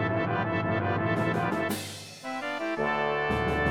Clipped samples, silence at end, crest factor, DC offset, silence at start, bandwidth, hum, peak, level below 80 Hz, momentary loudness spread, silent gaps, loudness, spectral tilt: under 0.1%; 0 s; 16 dB; under 0.1%; 0 s; 16.5 kHz; none; -12 dBFS; -48 dBFS; 7 LU; none; -29 LUFS; -6 dB/octave